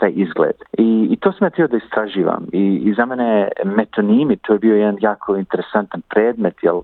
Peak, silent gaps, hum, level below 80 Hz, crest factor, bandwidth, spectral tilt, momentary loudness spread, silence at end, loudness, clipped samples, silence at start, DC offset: -2 dBFS; none; none; -58 dBFS; 16 dB; 4.2 kHz; -10.5 dB/octave; 5 LU; 0 s; -17 LUFS; under 0.1%; 0 s; under 0.1%